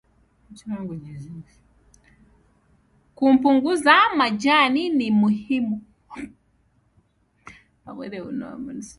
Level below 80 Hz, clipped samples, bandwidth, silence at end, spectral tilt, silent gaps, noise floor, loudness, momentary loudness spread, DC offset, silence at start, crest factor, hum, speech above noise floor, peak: -60 dBFS; under 0.1%; 11.5 kHz; 0.1 s; -5 dB/octave; none; -64 dBFS; -20 LUFS; 24 LU; under 0.1%; 0.5 s; 22 dB; none; 43 dB; -2 dBFS